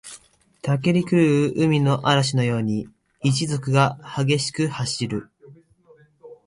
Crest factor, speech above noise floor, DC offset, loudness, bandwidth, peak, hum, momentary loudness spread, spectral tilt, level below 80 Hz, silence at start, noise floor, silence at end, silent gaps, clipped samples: 18 dB; 34 dB; under 0.1%; -21 LUFS; 11.5 kHz; -6 dBFS; none; 10 LU; -5.5 dB/octave; -56 dBFS; 0.05 s; -55 dBFS; 0.1 s; none; under 0.1%